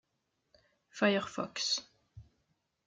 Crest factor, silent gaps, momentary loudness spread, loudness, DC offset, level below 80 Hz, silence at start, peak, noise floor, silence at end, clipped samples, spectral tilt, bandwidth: 22 dB; none; 8 LU; -33 LUFS; under 0.1%; -72 dBFS; 0.95 s; -16 dBFS; -82 dBFS; 0.65 s; under 0.1%; -3 dB/octave; 9.4 kHz